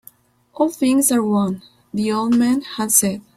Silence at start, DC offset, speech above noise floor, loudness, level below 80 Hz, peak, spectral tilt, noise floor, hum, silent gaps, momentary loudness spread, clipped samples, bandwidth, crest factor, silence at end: 0.6 s; under 0.1%; 32 dB; -18 LUFS; -58 dBFS; 0 dBFS; -4 dB/octave; -49 dBFS; none; none; 9 LU; under 0.1%; 16 kHz; 18 dB; 0.15 s